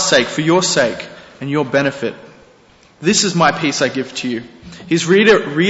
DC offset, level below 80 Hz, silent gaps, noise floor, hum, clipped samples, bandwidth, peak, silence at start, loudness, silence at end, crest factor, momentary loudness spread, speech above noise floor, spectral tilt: under 0.1%; -54 dBFS; none; -48 dBFS; none; under 0.1%; 8.2 kHz; -2 dBFS; 0 s; -15 LUFS; 0 s; 14 dB; 16 LU; 33 dB; -3.5 dB/octave